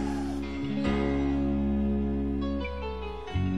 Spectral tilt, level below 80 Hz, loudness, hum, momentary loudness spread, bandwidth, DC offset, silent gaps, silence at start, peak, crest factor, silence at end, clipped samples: -8 dB/octave; -36 dBFS; -30 LUFS; none; 7 LU; 11.5 kHz; 0.6%; none; 0 s; -14 dBFS; 14 dB; 0 s; under 0.1%